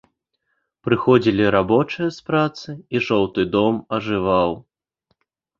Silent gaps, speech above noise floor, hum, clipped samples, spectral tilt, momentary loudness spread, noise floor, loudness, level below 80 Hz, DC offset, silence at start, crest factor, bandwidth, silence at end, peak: none; 54 dB; none; under 0.1%; -7 dB/octave; 9 LU; -73 dBFS; -19 LUFS; -50 dBFS; under 0.1%; 0.85 s; 18 dB; 7.2 kHz; 1 s; -2 dBFS